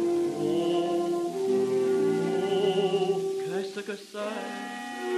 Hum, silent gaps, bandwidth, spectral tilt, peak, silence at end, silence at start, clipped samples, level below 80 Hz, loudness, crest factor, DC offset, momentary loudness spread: none; none; 13.5 kHz; -5.5 dB/octave; -14 dBFS; 0 s; 0 s; under 0.1%; -80 dBFS; -28 LUFS; 12 dB; under 0.1%; 10 LU